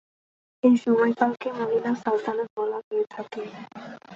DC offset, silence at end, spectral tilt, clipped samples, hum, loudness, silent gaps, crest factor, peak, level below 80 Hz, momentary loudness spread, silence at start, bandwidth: under 0.1%; 0 s; -6.5 dB/octave; under 0.1%; none; -25 LUFS; 2.50-2.56 s, 2.84-2.91 s; 18 dB; -8 dBFS; -72 dBFS; 17 LU; 0.65 s; 7.4 kHz